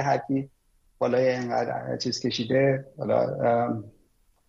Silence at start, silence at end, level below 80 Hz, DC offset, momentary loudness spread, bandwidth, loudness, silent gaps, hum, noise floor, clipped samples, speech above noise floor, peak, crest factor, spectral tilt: 0 s; 0.6 s; -64 dBFS; under 0.1%; 7 LU; 7.8 kHz; -26 LUFS; none; none; -64 dBFS; under 0.1%; 39 dB; -10 dBFS; 16 dB; -6 dB/octave